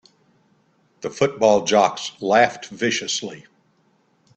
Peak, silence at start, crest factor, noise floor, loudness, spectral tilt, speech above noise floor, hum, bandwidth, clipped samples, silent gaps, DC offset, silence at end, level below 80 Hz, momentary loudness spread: 0 dBFS; 1.05 s; 22 dB; -62 dBFS; -20 LUFS; -3 dB/octave; 43 dB; none; 8.8 kHz; under 0.1%; none; under 0.1%; 0.95 s; -64 dBFS; 14 LU